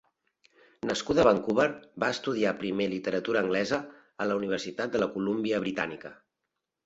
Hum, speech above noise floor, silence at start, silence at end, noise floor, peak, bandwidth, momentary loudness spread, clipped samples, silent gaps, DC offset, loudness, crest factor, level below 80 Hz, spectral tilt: none; 56 dB; 0.85 s; 0.7 s; -85 dBFS; -8 dBFS; 8 kHz; 10 LU; under 0.1%; none; under 0.1%; -29 LUFS; 22 dB; -62 dBFS; -5 dB/octave